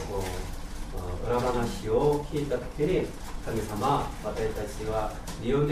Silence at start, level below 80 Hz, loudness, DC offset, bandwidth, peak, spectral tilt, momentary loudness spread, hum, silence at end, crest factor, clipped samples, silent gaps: 0 s; -38 dBFS; -30 LUFS; under 0.1%; 15.5 kHz; -12 dBFS; -6 dB/octave; 11 LU; none; 0 s; 16 dB; under 0.1%; none